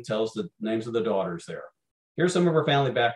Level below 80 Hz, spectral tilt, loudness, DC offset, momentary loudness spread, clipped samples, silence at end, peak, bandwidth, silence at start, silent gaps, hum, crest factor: -70 dBFS; -6 dB/octave; -26 LUFS; under 0.1%; 16 LU; under 0.1%; 0 s; -10 dBFS; 11.5 kHz; 0 s; 1.91-2.15 s; none; 16 dB